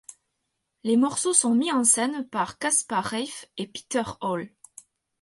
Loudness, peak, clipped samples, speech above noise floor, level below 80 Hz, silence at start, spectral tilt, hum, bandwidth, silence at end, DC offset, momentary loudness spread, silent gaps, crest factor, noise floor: -24 LUFS; -6 dBFS; under 0.1%; 54 dB; -66 dBFS; 0.85 s; -2.5 dB/octave; none; 11.5 kHz; 0.75 s; under 0.1%; 14 LU; none; 22 dB; -79 dBFS